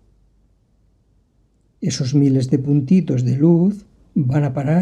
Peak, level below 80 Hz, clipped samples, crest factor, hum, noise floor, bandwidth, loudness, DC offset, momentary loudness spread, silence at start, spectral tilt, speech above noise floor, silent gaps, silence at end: -4 dBFS; -54 dBFS; under 0.1%; 16 dB; none; -59 dBFS; 9.8 kHz; -18 LUFS; under 0.1%; 10 LU; 1.8 s; -7.5 dB/octave; 43 dB; none; 0 s